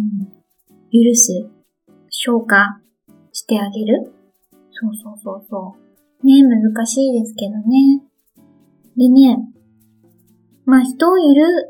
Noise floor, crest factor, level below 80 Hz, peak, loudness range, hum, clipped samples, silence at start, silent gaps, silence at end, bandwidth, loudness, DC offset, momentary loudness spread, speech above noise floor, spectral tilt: -54 dBFS; 16 dB; -68 dBFS; 0 dBFS; 5 LU; none; under 0.1%; 0 s; none; 0.05 s; 18.5 kHz; -14 LUFS; under 0.1%; 20 LU; 41 dB; -3.5 dB/octave